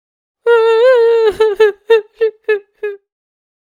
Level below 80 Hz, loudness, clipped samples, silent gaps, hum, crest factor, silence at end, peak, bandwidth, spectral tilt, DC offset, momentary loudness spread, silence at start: -54 dBFS; -12 LUFS; under 0.1%; none; none; 14 dB; 0.7 s; 0 dBFS; 10 kHz; -3 dB/octave; under 0.1%; 13 LU; 0.45 s